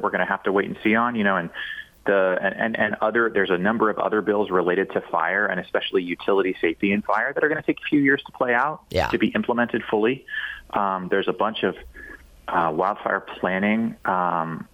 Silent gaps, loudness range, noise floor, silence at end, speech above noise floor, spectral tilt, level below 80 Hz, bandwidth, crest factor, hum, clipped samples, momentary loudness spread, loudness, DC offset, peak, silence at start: none; 3 LU; -43 dBFS; 0.1 s; 20 dB; -7 dB/octave; -54 dBFS; 13.5 kHz; 18 dB; none; under 0.1%; 6 LU; -23 LUFS; under 0.1%; -6 dBFS; 0 s